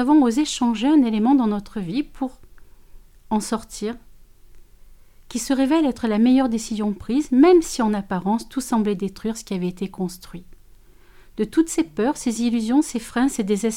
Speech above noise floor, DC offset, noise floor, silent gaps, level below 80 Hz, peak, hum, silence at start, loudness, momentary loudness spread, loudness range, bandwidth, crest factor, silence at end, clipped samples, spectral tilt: 28 dB; under 0.1%; -48 dBFS; none; -46 dBFS; -4 dBFS; none; 0 s; -21 LUFS; 13 LU; 10 LU; 16 kHz; 16 dB; 0 s; under 0.1%; -5 dB/octave